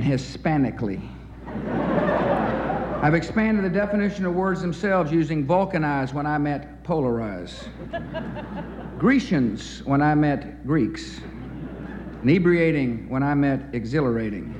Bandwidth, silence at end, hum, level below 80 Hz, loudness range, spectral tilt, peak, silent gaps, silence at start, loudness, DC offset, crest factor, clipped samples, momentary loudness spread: 9.4 kHz; 0 s; none; -42 dBFS; 3 LU; -7.5 dB/octave; -8 dBFS; none; 0 s; -23 LUFS; under 0.1%; 16 dB; under 0.1%; 15 LU